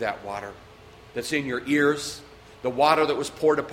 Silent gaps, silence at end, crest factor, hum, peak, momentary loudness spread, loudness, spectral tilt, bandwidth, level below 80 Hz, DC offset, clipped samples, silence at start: none; 0 s; 20 dB; none; -4 dBFS; 15 LU; -24 LUFS; -4 dB/octave; 16 kHz; -58 dBFS; under 0.1%; under 0.1%; 0 s